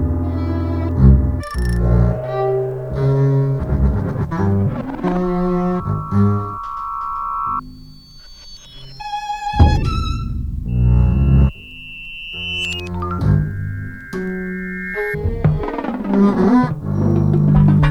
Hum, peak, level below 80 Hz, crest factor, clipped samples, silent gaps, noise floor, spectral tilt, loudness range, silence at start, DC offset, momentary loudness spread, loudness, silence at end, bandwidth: none; 0 dBFS; -24 dBFS; 16 dB; under 0.1%; none; -39 dBFS; -8 dB/octave; 5 LU; 0 s; under 0.1%; 12 LU; -18 LUFS; 0 s; 10.5 kHz